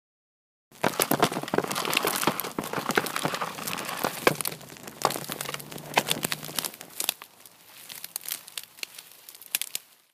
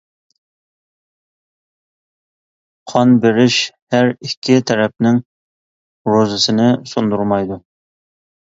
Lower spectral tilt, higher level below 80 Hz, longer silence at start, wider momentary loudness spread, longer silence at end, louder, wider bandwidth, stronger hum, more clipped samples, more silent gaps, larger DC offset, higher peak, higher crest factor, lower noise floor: second, -2.5 dB/octave vs -5 dB/octave; second, -66 dBFS vs -56 dBFS; second, 0.7 s vs 2.85 s; first, 15 LU vs 8 LU; second, 0.35 s vs 0.9 s; second, -29 LUFS vs -15 LUFS; first, 16 kHz vs 7.8 kHz; neither; neither; second, none vs 3.82-3.87 s, 4.37-4.42 s, 5.25-6.05 s; neither; about the same, -2 dBFS vs 0 dBFS; first, 30 dB vs 18 dB; second, -52 dBFS vs under -90 dBFS